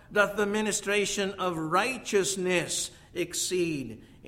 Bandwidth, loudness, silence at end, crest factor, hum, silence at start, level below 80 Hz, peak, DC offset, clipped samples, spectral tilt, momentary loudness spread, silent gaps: 16 kHz; -28 LUFS; 0 s; 20 dB; none; 0.1 s; -58 dBFS; -8 dBFS; under 0.1%; under 0.1%; -3 dB/octave; 6 LU; none